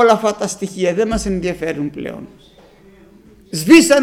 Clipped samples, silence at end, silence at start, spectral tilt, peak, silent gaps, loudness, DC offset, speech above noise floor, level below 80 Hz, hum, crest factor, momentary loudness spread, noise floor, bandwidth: under 0.1%; 0 s; 0 s; -4.5 dB/octave; 0 dBFS; none; -16 LUFS; under 0.1%; 30 dB; -40 dBFS; none; 16 dB; 18 LU; -45 dBFS; 16 kHz